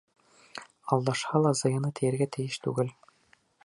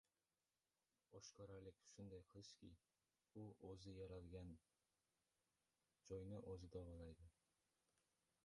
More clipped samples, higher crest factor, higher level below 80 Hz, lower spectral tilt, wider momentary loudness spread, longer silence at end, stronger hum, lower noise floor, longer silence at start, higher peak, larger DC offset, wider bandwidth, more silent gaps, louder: neither; about the same, 22 dB vs 18 dB; about the same, -70 dBFS vs -72 dBFS; about the same, -5.5 dB/octave vs -6 dB/octave; first, 18 LU vs 9 LU; second, 0.75 s vs 1.15 s; neither; second, -66 dBFS vs under -90 dBFS; second, 0.55 s vs 1.1 s; first, -8 dBFS vs -44 dBFS; neither; about the same, 11.5 kHz vs 11 kHz; neither; first, -29 LUFS vs -60 LUFS